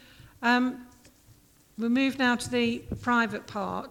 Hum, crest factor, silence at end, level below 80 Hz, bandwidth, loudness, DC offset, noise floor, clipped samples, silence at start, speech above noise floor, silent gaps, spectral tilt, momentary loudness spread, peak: none; 16 dB; 0 s; -56 dBFS; 15.5 kHz; -27 LUFS; under 0.1%; -58 dBFS; under 0.1%; 0.2 s; 31 dB; none; -4.5 dB/octave; 9 LU; -12 dBFS